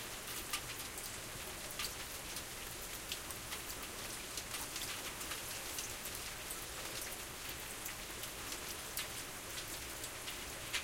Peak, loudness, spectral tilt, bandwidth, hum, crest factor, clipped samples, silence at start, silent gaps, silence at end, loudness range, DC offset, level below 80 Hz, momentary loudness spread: -20 dBFS; -43 LUFS; -1 dB/octave; 17 kHz; none; 24 dB; under 0.1%; 0 s; none; 0 s; 1 LU; under 0.1%; -58 dBFS; 3 LU